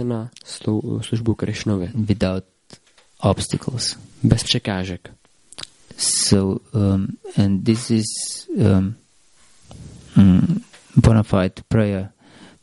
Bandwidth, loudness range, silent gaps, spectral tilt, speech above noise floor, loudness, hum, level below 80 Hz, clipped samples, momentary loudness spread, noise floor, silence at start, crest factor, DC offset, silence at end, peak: 11.5 kHz; 4 LU; none; -5.5 dB/octave; 37 dB; -20 LUFS; none; -40 dBFS; under 0.1%; 15 LU; -56 dBFS; 0 s; 20 dB; under 0.1%; 0.15 s; -2 dBFS